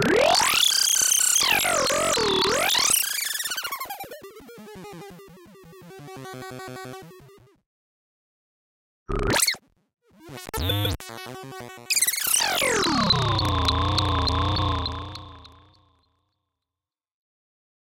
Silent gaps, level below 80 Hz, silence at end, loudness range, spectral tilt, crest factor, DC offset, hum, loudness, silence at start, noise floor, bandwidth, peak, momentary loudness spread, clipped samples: 7.66-9.06 s; -42 dBFS; 2.5 s; 21 LU; -2 dB/octave; 20 dB; under 0.1%; none; -21 LUFS; 0 s; under -90 dBFS; 17 kHz; -6 dBFS; 23 LU; under 0.1%